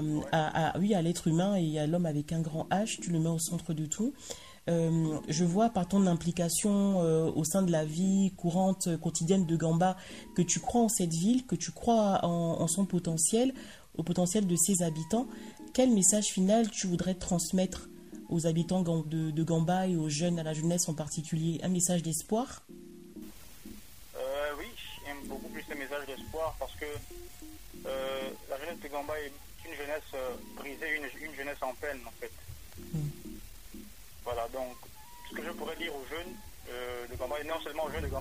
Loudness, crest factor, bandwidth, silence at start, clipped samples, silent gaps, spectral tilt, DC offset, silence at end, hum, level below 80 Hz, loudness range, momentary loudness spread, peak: -31 LUFS; 20 dB; 16 kHz; 0 s; under 0.1%; none; -5 dB/octave; 0.2%; 0 s; none; -56 dBFS; 12 LU; 19 LU; -12 dBFS